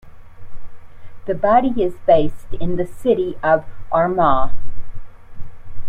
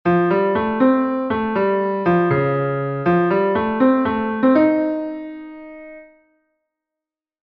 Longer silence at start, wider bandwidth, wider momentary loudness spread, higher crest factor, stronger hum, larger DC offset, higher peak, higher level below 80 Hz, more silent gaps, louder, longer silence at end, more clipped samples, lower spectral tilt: about the same, 0.05 s vs 0.05 s; second, 4 kHz vs 5.2 kHz; second, 13 LU vs 16 LU; about the same, 14 dB vs 16 dB; neither; neither; about the same, -2 dBFS vs -4 dBFS; first, -34 dBFS vs -52 dBFS; neither; about the same, -18 LUFS vs -18 LUFS; second, 0 s vs 1.4 s; neither; second, -8 dB/octave vs -10 dB/octave